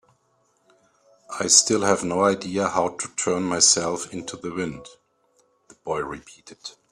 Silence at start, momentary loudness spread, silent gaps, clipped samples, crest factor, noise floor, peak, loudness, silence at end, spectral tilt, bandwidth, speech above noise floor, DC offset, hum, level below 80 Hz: 1.3 s; 23 LU; none; under 0.1%; 24 dB; -66 dBFS; 0 dBFS; -21 LUFS; 0.2 s; -2 dB/octave; 14.5 kHz; 43 dB; under 0.1%; none; -62 dBFS